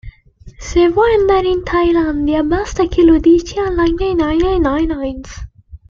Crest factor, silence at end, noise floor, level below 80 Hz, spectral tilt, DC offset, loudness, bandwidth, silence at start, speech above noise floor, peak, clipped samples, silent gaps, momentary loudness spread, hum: 12 dB; 0.15 s; -40 dBFS; -28 dBFS; -6 dB/octave; under 0.1%; -14 LUFS; 7.4 kHz; 0.05 s; 27 dB; -2 dBFS; under 0.1%; none; 11 LU; none